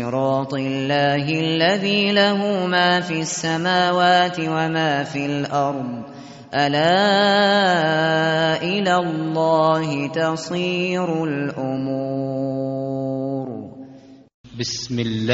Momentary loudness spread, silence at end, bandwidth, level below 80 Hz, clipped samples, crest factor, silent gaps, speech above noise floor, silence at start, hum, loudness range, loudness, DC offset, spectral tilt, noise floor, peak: 10 LU; 0 s; 8 kHz; -60 dBFS; under 0.1%; 16 dB; 14.34-14.44 s; 24 dB; 0 s; none; 7 LU; -20 LUFS; under 0.1%; -3.5 dB/octave; -44 dBFS; -4 dBFS